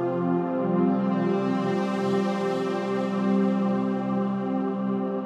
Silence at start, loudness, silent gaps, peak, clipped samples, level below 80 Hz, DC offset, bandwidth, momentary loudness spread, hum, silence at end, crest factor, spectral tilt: 0 s; -25 LUFS; none; -12 dBFS; under 0.1%; -74 dBFS; under 0.1%; 8.6 kHz; 4 LU; none; 0 s; 14 dB; -8 dB/octave